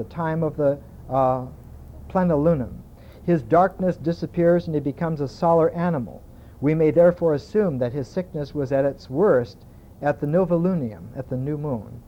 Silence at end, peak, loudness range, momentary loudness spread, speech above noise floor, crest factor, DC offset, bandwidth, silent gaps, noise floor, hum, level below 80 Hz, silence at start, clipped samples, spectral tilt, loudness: 0.1 s; -6 dBFS; 2 LU; 11 LU; 19 dB; 16 dB; under 0.1%; 8 kHz; none; -40 dBFS; none; -46 dBFS; 0 s; under 0.1%; -9.5 dB/octave; -22 LUFS